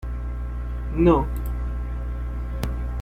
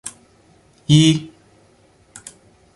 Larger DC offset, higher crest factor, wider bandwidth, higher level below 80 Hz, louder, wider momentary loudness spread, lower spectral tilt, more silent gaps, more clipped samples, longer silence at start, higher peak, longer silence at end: neither; about the same, 20 dB vs 20 dB; first, 15.5 kHz vs 11.5 kHz; first, -28 dBFS vs -52 dBFS; second, -26 LUFS vs -15 LUFS; second, 12 LU vs 26 LU; first, -8.5 dB/octave vs -5.5 dB/octave; neither; neither; about the same, 0 s vs 0.05 s; second, -6 dBFS vs -2 dBFS; second, 0 s vs 1.5 s